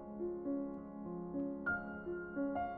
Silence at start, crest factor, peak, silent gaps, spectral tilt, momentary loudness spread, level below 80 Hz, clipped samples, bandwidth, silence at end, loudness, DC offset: 0 s; 14 dB; -28 dBFS; none; -7 dB/octave; 6 LU; -64 dBFS; under 0.1%; 3.2 kHz; 0 s; -42 LUFS; under 0.1%